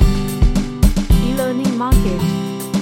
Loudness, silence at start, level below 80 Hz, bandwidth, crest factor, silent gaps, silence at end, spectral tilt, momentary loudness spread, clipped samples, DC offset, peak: -17 LUFS; 0 s; -18 dBFS; 17 kHz; 14 dB; none; 0 s; -6.5 dB/octave; 4 LU; under 0.1%; under 0.1%; 0 dBFS